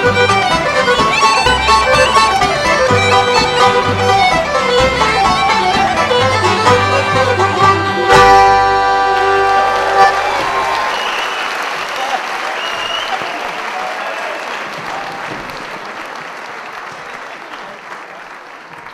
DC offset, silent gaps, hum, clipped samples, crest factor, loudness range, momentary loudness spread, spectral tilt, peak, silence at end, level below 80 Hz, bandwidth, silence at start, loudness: under 0.1%; none; none; 0.1%; 14 dB; 14 LU; 17 LU; -3.5 dB/octave; 0 dBFS; 0 s; -36 dBFS; 15.5 kHz; 0 s; -12 LUFS